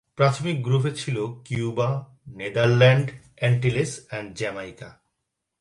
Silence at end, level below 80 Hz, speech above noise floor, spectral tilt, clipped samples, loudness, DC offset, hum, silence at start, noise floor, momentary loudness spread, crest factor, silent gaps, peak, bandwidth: 0.7 s; -56 dBFS; 57 dB; -6 dB/octave; under 0.1%; -23 LUFS; under 0.1%; none; 0.2 s; -80 dBFS; 17 LU; 20 dB; none; -4 dBFS; 11.5 kHz